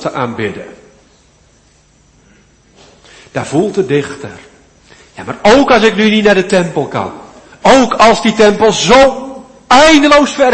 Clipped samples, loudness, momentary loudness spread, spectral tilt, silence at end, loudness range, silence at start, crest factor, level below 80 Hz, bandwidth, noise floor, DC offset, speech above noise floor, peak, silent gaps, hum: 0.3%; -9 LUFS; 18 LU; -4 dB/octave; 0 s; 14 LU; 0 s; 12 dB; -38 dBFS; 11 kHz; -48 dBFS; under 0.1%; 39 dB; 0 dBFS; none; none